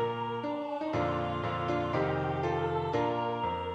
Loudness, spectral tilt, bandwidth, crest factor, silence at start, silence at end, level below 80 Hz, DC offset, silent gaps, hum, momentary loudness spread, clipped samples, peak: -32 LUFS; -7.5 dB/octave; 9 kHz; 14 dB; 0 s; 0 s; -56 dBFS; under 0.1%; none; none; 4 LU; under 0.1%; -18 dBFS